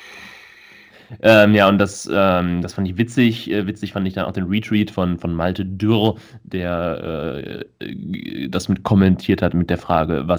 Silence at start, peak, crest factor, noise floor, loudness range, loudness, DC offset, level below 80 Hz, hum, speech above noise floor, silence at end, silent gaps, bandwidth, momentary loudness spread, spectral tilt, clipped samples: 0 s; 0 dBFS; 18 dB; -46 dBFS; 6 LU; -18 LUFS; under 0.1%; -44 dBFS; none; 27 dB; 0 s; none; 20 kHz; 16 LU; -6.5 dB/octave; under 0.1%